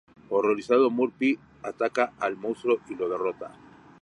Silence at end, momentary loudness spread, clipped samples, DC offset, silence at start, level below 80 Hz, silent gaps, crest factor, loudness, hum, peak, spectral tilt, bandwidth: 0.5 s; 10 LU; under 0.1%; under 0.1%; 0.3 s; -70 dBFS; none; 18 dB; -26 LUFS; none; -8 dBFS; -6 dB/octave; 11 kHz